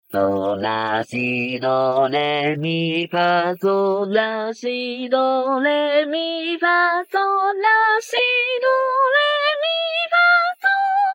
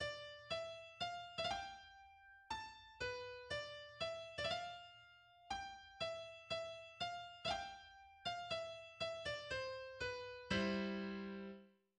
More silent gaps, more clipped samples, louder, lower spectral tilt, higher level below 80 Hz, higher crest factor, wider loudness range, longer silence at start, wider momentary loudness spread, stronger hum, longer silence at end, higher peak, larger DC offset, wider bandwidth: neither; neither; first, -18 LUFS vs -46 LUFS; about the same, -5 dB/octave vs -4 dB/octave; about the same, -72 dBFS vs -70 dBFS; second, 12 dB vs 20 dB; about the same, 3 LU vs 3 LU; about the same, 0.1 s vs 0 s; second, 6 LU vs 14 LU; neither; second, 0 s vs 0.25 s; first, -6 dBFS vs -28 dBFS; neither; first, 19.5 kHz vs 11 kHz